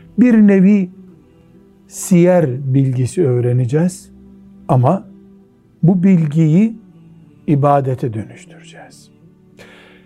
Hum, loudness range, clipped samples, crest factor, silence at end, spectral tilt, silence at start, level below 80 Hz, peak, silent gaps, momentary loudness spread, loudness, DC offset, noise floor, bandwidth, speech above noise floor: none; 4 LU; under 0.1%; 16 dB; 1.2 s; -8.5 dB/octave; 0.15 s; -54 dBFS; 0 dBFS; none; 17 LU; -14 LUFS; under 0.1%; -47 dBFS; 13 kHz; 34 dB